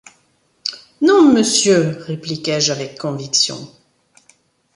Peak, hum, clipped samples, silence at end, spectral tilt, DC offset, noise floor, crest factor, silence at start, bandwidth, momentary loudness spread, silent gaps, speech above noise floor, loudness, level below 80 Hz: -2 dBFS; none; under 0.1%; 1.1 s; -3.5 dB/octave; under 0.1%; -60 dBFS; 16 dB; 0.65 s; 11.5 kHz; 15 LU; none; 42 dB; -16 LUFS; -60 dBFS